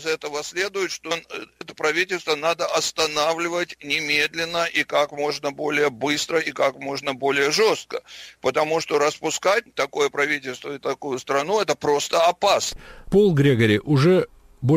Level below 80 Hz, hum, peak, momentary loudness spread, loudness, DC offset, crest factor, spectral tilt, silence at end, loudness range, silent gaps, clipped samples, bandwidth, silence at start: -52 dBFS; none; -6 dBFS; 10 LU; -22 LUFS; under 0.1%; 16 dB; -4 dB/octave; 0 s; 4 LU; none; under 0.1%; 16 kHz; 0 s